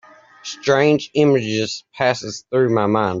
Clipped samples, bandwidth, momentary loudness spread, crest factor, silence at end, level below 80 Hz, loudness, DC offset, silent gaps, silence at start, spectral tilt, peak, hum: under 0.1%; 7.8 kHz; 10 LU; 16 dB; 0 s; -60 dBFS; -18 LUFS; under 0.1%; none; 0.45 s; -5.5 dB/octave; -2 dBFS; none